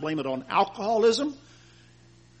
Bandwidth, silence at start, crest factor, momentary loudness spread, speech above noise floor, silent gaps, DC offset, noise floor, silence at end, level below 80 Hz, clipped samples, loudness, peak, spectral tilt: 8.4 kHz; 0 s; 18 dB; 10 LU; 30 dB; none; under 0.1%; -55 dBFS; 1.05 s; -66 dBFS; under 0.1%; -25 LUFS; -10 dBFS; -4.5 dB/octave